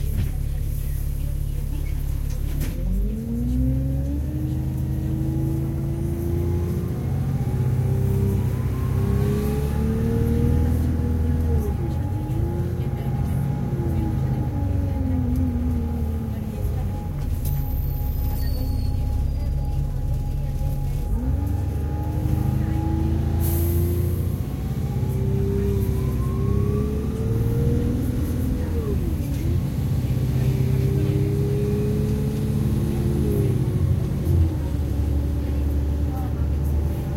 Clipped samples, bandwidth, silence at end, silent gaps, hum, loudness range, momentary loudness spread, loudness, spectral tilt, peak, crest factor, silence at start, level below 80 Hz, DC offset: under 0.1%; 16.5 kHz; 0 s; none; none; 4 LU; 5 LU; -24 LUFS; -8.5 dB/octave; -8 dBFS; 14 dB; 0 s; -28 dBFS; under 0.1%